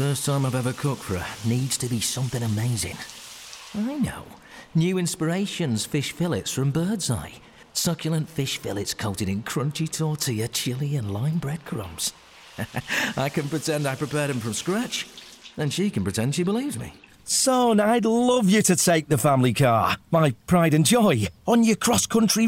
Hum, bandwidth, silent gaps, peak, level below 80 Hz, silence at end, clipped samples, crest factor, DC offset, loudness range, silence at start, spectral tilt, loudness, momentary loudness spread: none; 17 kHz; none; -10 dBFS; -56 dBFS; 0 s; under 0.1%; 14 dB; under 0.1%; 7 LU; 0 s; -4.5 dB/octave; -24 LUFS; 12 LU